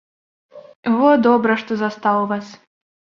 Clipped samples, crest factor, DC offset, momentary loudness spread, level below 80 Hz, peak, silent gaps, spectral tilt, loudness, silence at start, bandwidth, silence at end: under 0.1%; 18 dB; under 0.1%; 11 LU; -66 dBFS; -2 dBFS; 0.76-0.83 s; -7 dB/octave; -17 LUFS; 0.55 s; 7 kHz; 0.5 s